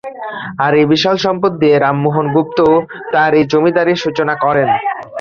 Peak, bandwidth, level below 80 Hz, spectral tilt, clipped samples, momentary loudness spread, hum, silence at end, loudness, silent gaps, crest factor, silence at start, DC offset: -2 dBFS; 7 kHz; -52 dBFS; -6.5 dB/octave; under 0.1%; 6 LU; none; 0 s; -13 LUFS; none; 12 dB; 0.05 s; under 0.1%